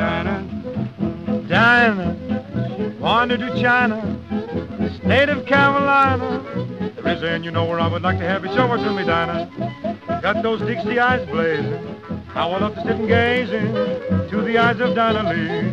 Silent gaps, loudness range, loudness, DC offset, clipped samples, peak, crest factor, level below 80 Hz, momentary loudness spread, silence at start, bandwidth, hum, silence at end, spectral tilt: none; 3 LU; -19 LUFS; 0.1%; under 0.1%; -2 dBFS; 18 dB; -48 dBFS; 11 LU; 0 s; 8 kHz; none; 0 s; -7 dB/octave